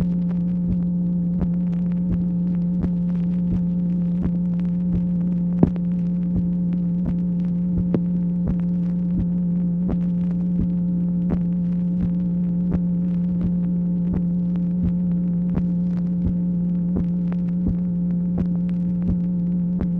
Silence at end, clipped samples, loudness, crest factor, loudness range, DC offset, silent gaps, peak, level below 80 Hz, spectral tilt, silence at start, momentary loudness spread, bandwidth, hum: 0 s; under 0.1%; -22 LUFS; 20 dB; 1 LU; under 0.1%; none; 0 dBFS; -38 dBFS; -12.5 dB/octave; 0 s; 1 LU; 2.2 kHz; none